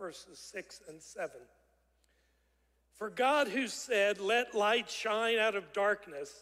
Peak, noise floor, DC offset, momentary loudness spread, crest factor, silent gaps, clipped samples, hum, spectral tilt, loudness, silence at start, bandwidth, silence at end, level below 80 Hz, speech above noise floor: -16 dBFS; -74 dBFS; under 0.1%; 16 LU; 18 dB; none; under 0.1%; none; -2 dB/octave; -32 LUFS; 0 s; 16 kHz; 0 s; -76 dBFS; 40 dB